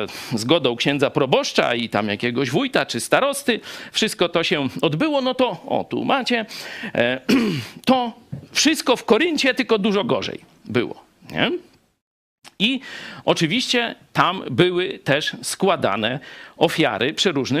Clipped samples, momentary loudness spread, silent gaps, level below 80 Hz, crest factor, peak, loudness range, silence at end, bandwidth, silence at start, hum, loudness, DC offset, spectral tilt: under 0.1%; 8 LU; 12.02-12.38 s; -60 dBFS; 20 dB; 0 dBFS; 3 LU; 0 s; 15.5 kHz; 0 s; none; -20 LUFS; under 0.1%; -4 dB/octave